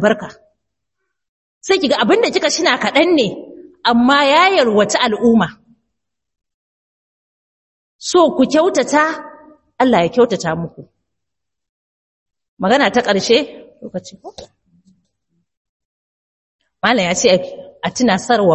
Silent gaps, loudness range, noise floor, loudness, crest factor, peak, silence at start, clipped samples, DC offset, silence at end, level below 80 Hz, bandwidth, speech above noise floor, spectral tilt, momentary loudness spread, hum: 1.29-1.61 s, 6.54-7.99 s, 11.69-12.26 s, 12.48-12.57 s, 15.57-16.59 s; 8 LU; -82 dBFS; -14 LUFS; 16 dB; 0 dBFS; 0 s; under 0.1%; under 0.1%; 0 s; -54 dBFS; 8.6 kHz; 68 dB; -4 dB/octave; 17 LU; none